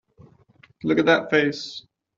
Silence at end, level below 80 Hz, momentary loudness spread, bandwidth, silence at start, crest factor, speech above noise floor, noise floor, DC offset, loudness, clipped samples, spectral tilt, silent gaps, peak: 0.4 s; -64 dBFS; 16 LU; 7.6 kHz; 0.85 s; 22 dB; 35 dB; -56 dBFS; under 0.1%; -21 LUFS; under 0.1%; -5.5 dB/octave; none; -4 dBFS